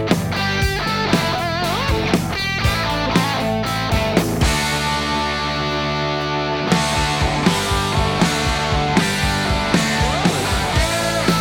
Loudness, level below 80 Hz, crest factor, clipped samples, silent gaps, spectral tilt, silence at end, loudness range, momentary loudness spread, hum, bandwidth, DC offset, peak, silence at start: -18 LUFS; -30 dBFS; 16 dB; under 0.1%; none; -4.5 dB/octave; 0 s; 1 LU; 3 LU; none; 19.5 kHz; under 0.1%; -2 dBFS; 0 s